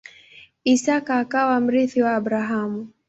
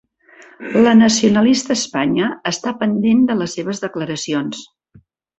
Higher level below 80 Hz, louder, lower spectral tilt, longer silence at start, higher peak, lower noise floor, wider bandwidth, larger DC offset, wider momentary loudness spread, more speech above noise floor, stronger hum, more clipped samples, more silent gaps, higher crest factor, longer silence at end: second, -64 dBFS vs -54 dBFS; second, -21 LUFS vs -16 LUFS; about the same, -4.5 dB/octave vs -4.5 dB/octave; about the same, 0.65 s vs 0.6 s; second, -6 dBFS vs -2 dBFS; about the same, -49 dBFS vs -51 dBFS; about the same, 8 kHz vs 8.2 kHz; neither; second, 6 LU vs 12 LU; second, 29 dB vs 35 dB; neither; neither; neither; about the same, 14 dB vs 16 dB; second, 0.2 s vs 0.75 s